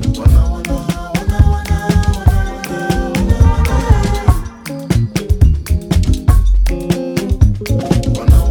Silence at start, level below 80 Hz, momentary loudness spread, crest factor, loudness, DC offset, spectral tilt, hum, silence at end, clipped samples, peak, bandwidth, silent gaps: 0 s; -14 dBFS; 7 LU; 12 dB; -15 LUFS; under 0.1%; -6.5 dB/octave; none; 0 s; under 0.1%; 0 dBFS; 18 kHz; none